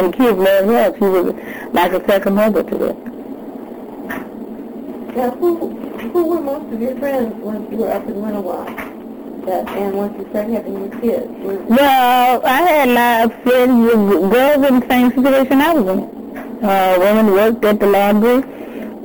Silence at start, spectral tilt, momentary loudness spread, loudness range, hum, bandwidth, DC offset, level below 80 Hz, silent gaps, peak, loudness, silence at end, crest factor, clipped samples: 0 s; -6 dB/octave; 17 LU; 10 LU; none; over 20 kHz; under 0.1%; -48 dBFS; none; -4 dBFS; -15 LUFS; 0 s; 12 dB; under 0.1%